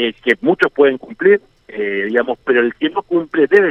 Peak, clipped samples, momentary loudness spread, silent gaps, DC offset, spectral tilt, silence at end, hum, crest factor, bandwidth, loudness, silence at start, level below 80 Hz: 0 dBFS; under 0.1%; 7 LU; none; under 0.1%; -6.5 dB/octave; 0 s; none; 14 dB; 5.8 kHz; -16 LUFS; 0 s; -56 dBFS